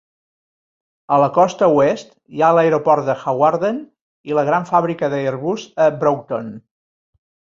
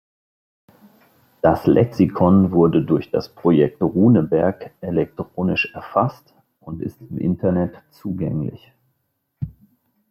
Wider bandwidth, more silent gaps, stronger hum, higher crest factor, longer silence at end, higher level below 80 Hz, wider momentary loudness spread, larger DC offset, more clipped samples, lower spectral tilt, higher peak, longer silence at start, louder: second, 7.6 kHz vs 13.5 kHz; first, 4.01-4.24 s vs none; neither; about the same, 16 dB vs 18 dB; first, 1 s vs 0.6 s; second, -62 dBFS vs -50 dBFS; second, 11 LU vs 16 LU; neither; neither; second, -6.5 dB/octave vs -9.5 dB/octave; about the same, -2 dBFS vs -2 dBFS; second, 1.1 s vs 1.45 s; about the same, -17 LUFS vs -19 LUFS